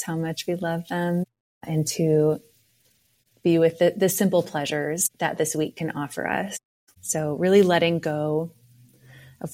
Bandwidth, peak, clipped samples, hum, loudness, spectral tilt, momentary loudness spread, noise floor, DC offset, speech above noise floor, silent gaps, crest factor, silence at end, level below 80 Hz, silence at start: 16.5 kHz; -6 dBFS; under 0.1%; none; -24 LUFS; -5 dB/octave; 11 LU; -65 dBFS; under 0.1%; 42 dB; 1.40-1.61 s, 6.65-6.87 s; 18 dB; 0 s; -64 dBFS; 0 s